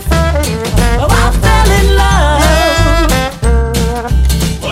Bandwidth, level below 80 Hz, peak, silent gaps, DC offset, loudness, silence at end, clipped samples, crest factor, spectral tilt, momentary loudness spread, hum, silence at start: 16 kHz; -12 dBFS; 0 dBFS; none; under 0.1%; -11 LUFS; 0 s; under 0.1%; 10 dB; -5 dB/octave; 5 LU; none; 0 s